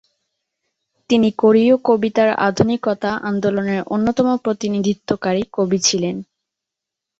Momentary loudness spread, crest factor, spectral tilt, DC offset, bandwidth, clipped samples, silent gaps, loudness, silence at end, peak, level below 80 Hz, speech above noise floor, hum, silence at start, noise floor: 7 LU; 16 dB; -5 dB/octave; under 0.1%; 8 kHz; under 0.1%; none; -17 LUFS; 0.95 s; -2 dBFS; -54 dBFS; 67 dB; none; 1.1 s; -84 dBFS